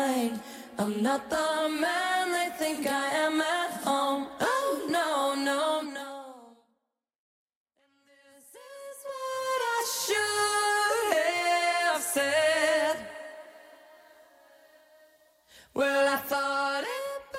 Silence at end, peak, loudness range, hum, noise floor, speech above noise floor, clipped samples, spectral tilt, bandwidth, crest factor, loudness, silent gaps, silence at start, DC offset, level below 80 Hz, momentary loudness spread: 0 s; -12 dBFS; 11 LU; none; -81 dBFS; 53 dB; under 0.1%; -2 dB/octave; 16 kHz; 18 dB; -28 LUFS; 7.18-7.47 s, 7.56-7.66 s; 0 s; under 0.1%; -72 dBFS; 15 LU